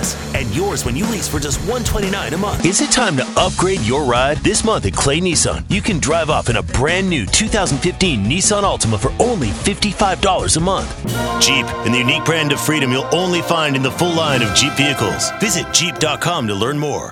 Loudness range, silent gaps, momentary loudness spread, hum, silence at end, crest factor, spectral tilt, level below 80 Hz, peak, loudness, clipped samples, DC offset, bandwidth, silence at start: 1 LU; none; 6 LU; none; 0 s; 16 dB; -3.5 dB/octave; -30 dBFS; 0 dBFS; -16 LUFS; under 0.1%; under 0.1%; 18 kHz; 0 s